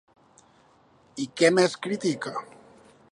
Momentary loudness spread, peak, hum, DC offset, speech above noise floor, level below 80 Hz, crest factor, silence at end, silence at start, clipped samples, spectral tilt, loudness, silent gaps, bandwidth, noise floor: 16 LU; -6 dBFS; none; under 0.1%; 35 dB; -74 dBFS; 22 dB; 0.7 s; 1.15 s; under 0.1%; -4.5 dB/octave; -25 LUFS; none; 11 kHz; -59 dBFS